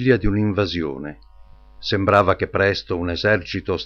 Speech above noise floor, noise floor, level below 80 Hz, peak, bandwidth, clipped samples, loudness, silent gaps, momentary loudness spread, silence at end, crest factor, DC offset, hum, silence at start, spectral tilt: 25 dB; -45 dBFS; -36 dBFS; -4 dBFS; 7.2 kHz; under 0.1%; -20 LUFS; none; 12 LU; 0 s; 16 dB; under 0.1%; none; 0 s; -7 dB/octave